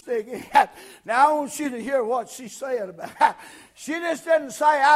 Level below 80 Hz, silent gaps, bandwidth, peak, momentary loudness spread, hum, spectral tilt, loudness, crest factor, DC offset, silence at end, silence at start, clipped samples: -66 dBFS; none; 15.5 kHz; -4 dBFS; 15 LU; none; -2.5 dB/octave; -23 LUFS; 20 dB; under 0.1%; 0 s; 0.05 s; under 0.1%